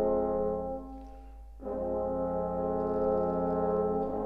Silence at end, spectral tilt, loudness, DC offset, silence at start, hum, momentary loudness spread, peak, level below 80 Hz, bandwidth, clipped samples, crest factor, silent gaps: 0 s; -11 dB/octave; -31 LUFS; under 0.1%; 0 s; none; 17 LU; -18 dBFS; -48 dBFS; 2.9 kHz; under 0.1%; 12 dB; none